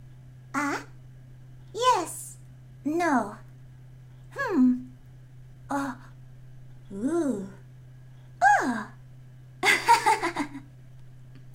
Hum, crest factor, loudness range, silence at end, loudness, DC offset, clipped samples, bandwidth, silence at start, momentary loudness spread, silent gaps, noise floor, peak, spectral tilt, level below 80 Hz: none; 22 dB; 6 LU; 0 s; -26 LUFS; under 0.1%; under 0.1%; 16 kHz; 0 s; 22 LU; none; -48 dBFS; -8 dBFS; -4 dB/octave; -56 dBFS